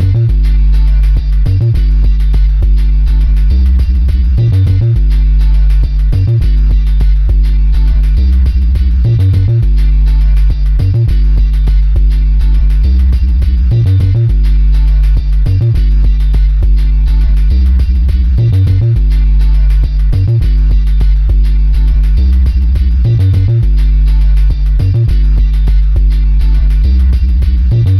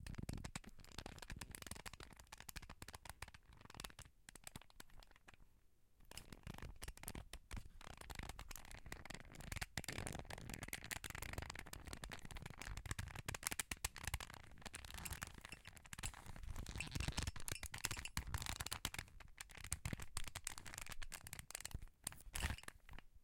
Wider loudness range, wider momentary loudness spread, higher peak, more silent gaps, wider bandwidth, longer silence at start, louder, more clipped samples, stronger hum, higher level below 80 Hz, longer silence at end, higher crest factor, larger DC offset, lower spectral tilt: second, 1 LU vs 10 LU; second, 2 LU vs 12 LU; first, -2 dBFS vs -16 dBFS; neither; second, 5.2 kHz vs 17 kHz; about the same, 0 s vs 0 s; first, -11 LUFS vs -50 LUFS; neither; neither; first, -8 dBFS vs -56 dBFS; about the same, 0 s vs 0 s; second, 6 dB vs 34 dB; neither; first, -8.5 dB/octave vs -2.5 dB/octave